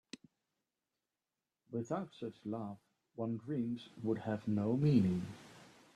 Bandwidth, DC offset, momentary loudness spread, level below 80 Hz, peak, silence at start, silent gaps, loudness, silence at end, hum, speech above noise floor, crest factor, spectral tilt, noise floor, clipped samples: 11 kHz; under 0.1%; 24 LU; -74 dBFS; -18 dBFS; 1.7 s; none; -38 LUFS; 0.25 s; none; over 54 dB; 22 dB; -8.5 dB/octave; under -90 dBFS; under 0.1%